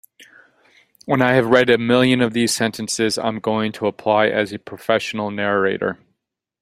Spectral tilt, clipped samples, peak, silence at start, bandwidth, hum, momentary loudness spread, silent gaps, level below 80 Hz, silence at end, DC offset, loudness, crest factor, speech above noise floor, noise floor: -4.5 dB/octave; under 0.1%; 0 dBFS; 0.2 s; 15.5 kHz; none; 10 LU; none; -58 dBFS; 0.65 s; under 0.1%; -18 LUFS; 20 dB; 56 dB; -75 dBFS